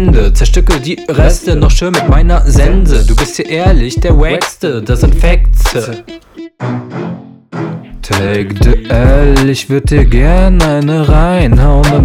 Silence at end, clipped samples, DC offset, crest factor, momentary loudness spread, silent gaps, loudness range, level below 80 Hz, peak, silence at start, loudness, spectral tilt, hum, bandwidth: 0 s; 2%; under 0.1%; 8 dB; 13 LU; none; 7 LU; -10 dBFS; 0 dBFS; 0 s; -11 LUFS; -6 dB/octave; none; 14 kHz